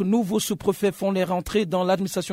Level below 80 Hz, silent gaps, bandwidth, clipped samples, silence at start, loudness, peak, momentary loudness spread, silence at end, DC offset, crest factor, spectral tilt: -50 dBFS; none; 16 kHz; under 0.1%; 0 s; -24 LUFS; -8 dBFS; 2 LU; 0 s; under 0.1%; 14 dB; -5.5 dB/octave